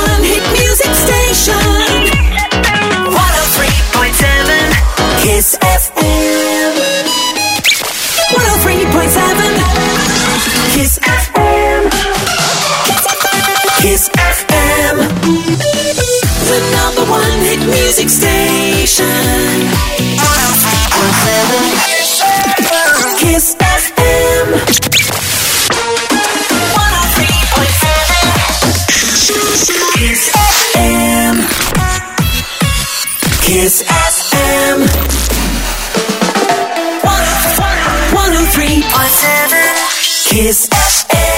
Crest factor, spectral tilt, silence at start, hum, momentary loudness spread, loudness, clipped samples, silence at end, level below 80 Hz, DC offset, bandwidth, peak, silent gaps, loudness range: 10 dB; -3 dB/octave; 0 s; none; 4 LU; -9 LUFS; under 0.1%; 0 s; -20 dBFS; under 0.1%; 16.5 kHz; 0 dBFS; none; 2 LU